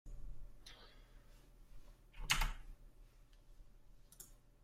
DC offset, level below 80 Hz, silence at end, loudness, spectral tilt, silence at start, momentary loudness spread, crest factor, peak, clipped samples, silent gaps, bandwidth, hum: under 0.1%; -50 dBFS; 0 s; -40 LUFS; -1 dB/octave; 0.05 s; 29 LU; 30 dB; -16 dBFS; under 0.1%; none; 16 kHz; none